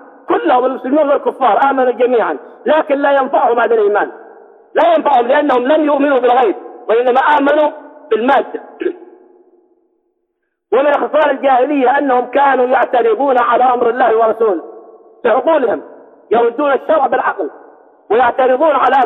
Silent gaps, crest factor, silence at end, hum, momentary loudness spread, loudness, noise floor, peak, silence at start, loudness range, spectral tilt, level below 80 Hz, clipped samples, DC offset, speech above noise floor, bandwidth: none; 12 dB; 0 s; none; 7 LU; -13 LUFS; -70 dBFS; -2 dBFS; 0.3 s; 4 LU; -6 dB/octave; -62 dBFS; under 0.1%; under 0.1%; 58 dB; 4.2 kHz